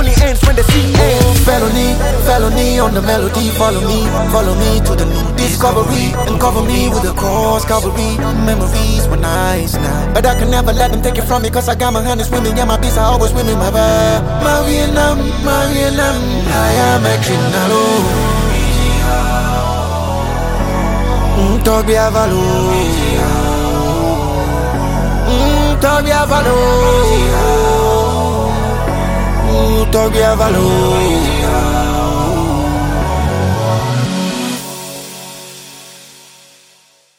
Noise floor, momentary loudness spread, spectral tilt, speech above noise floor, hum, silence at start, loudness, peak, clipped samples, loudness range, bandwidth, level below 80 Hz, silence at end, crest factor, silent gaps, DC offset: -49 dBFS; 5 LU; -5 dB/octave; 38 dB; none; 0 s; -13 LUFS; 0 dBFS; under 0.1%; 3 LU; 17 kHz; -18 dBFS; 1.2 s; 12 dB; none; under 0.1%